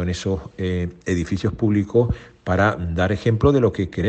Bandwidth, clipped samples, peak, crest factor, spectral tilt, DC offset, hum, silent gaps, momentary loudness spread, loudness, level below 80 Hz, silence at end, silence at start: 8.6 kHz; under 0.1%; -4 dBFS; 16 dB; -7.5 dB/octave; under 0.1%; none; none; 8 LU; -21 LUFS; -40 dBFS; 0 s; 0 s